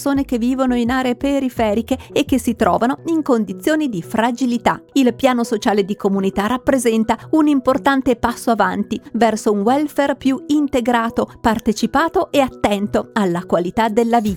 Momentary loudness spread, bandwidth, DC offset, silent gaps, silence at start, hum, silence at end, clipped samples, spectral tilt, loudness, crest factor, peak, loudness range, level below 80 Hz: 3 LU; 17.5 kHz; under 0.1%; none; 0 s; none; 0 s; under 0.1%; -5.5 dB/octave; -17 LUFS; 16 dB; 0 dBFS; 1 LU; -44 dBFS